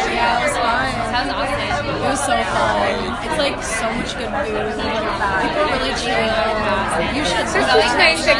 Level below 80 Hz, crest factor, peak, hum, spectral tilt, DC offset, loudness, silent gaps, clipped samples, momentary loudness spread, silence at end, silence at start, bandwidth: -36 dBFS; 18 dB; 0 dBFS; none; -3.5 dB/octave; under 0.1%; -18 LUFS; none; under 0.1%; 7 LU; 0 s; 0 s; 11.5 kHz